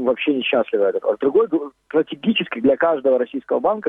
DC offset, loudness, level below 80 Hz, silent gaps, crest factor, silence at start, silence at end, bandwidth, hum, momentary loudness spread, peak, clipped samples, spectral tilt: under 0.1%; -19 LUFS; -62 dBFS; none; 14 dB; 0 s; 0 s; 3.9 kHz; none; 5 LU; -4 dBFS; under 0.1%; -8 dB/octave